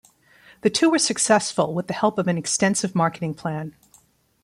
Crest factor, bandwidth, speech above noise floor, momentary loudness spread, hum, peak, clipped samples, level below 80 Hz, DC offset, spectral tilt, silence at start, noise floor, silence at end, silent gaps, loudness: 18 dB; 14.5 kHz; 37 dB; 10 LU; none; -6 dBFS; under 0.1%; -64 dBFS; under 0.1%; -4 dB/octave; 0.65 s; -58 dBFS; 0.75 s; none; -22 LUFS